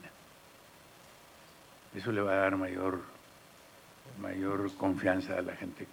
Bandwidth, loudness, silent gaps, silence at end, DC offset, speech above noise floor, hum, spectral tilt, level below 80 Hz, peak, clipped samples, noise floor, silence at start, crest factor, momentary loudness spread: 18.5 kHz; -34 LUFS; none; 0 s; under 0.1%; 24 dB; none; -6.5 dB/octave; -74 dBFS; -14 dBFS; under 0.1%; -57 dBFS; 0 s; 22 dB; 25 LU